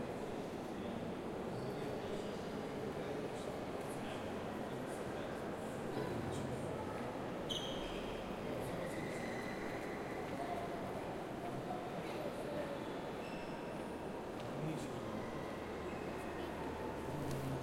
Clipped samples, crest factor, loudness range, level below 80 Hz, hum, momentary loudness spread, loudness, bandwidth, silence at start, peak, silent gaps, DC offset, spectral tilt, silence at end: under 0.1%; 16 dB; 2 LU; -62 dBFS; none; 3 LU; -44 LUFS; 16.5 kHz; 0 s; -26 dBFS; none; under 0.1%; -5.5 dB/octave; 0 s